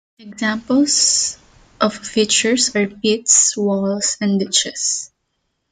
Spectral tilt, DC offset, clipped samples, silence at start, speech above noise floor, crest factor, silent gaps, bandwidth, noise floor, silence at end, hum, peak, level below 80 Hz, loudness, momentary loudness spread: -2 dB/octave; under 0.1%; under 0.1%; 0.2 s; 54 dB; 18 dB; none; 10 kHz; -71 dBFS; 0.65 s; none; 0 dBFS; -58 dBFS; -16 LUFS; 10 LU